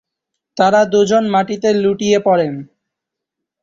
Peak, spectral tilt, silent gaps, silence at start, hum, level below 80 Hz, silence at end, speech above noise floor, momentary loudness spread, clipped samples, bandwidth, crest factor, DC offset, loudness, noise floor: 0 dBFS; -5 dB/octave; none; 0.55 s; none; -56 dBFS; 0.95 s; 68 dB; 8 LU; under 0.1%; 7.6 kHz; 16 dB; under 0.1%; -14 LUFS; -81 dBFS